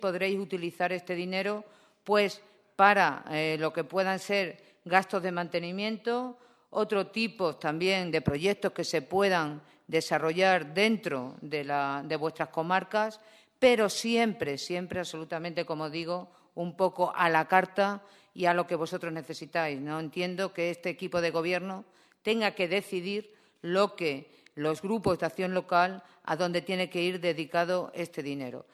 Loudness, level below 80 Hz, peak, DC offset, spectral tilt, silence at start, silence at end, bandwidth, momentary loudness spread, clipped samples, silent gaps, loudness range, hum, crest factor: -30 LUFS; -66 dBFS; -6 dBFS; under 0.1%; -5 dB/octave; 0 s; 0.1 s; 14 kHz; 11 LU; under 0.1%; none; 4 LU; none; 24 dB